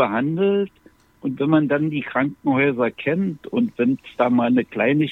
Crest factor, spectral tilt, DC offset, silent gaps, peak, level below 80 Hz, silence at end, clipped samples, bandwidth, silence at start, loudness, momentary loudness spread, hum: 18 dB; -9 dB/octave; under 0.1%; none; -4 dBFS; -60 dBFS; 0 s; under 0.1%; 4.1 kHz; 0 s; -21 LUFS; 6 LU; none